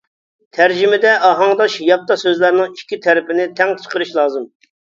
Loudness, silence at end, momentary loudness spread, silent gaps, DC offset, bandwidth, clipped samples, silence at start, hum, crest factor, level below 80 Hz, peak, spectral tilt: -14 LUFS; 0.4 s; 9 LU; none; under 0.1%; 7.6 kHz; under 0.1%; 0.55 s; none; 14 dB; -66 dBFS; 0 dBFS; -4 dB/octave